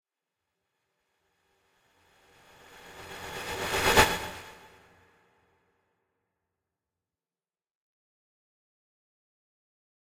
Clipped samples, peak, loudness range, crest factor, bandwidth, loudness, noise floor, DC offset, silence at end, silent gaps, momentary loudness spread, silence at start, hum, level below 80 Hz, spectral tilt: under 0.1%; -4 dBFS; 15 LU; 32 dB; 16.5 kHz; -26 LUFS; under -90 dBFS; under 0.1%; 5.45 s; none; 27 LU; 2.7 s; none; -52 dBFS; -2.5 dB/octave